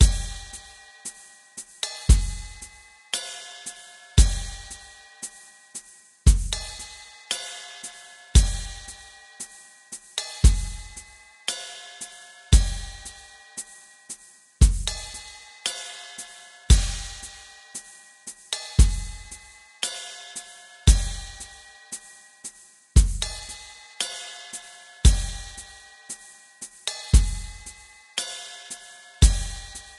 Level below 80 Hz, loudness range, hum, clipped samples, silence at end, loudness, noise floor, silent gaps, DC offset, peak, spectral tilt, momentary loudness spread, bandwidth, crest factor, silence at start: -26 dBFS; 3 LU; none; under 0.1%; 0.2 s; -26 LUFS; -47 dBFS; none; under 0.1%; -2 dBFS; -3.5 dB/octave; 21 LU; 12.5 kHz; 24 dB; 0 s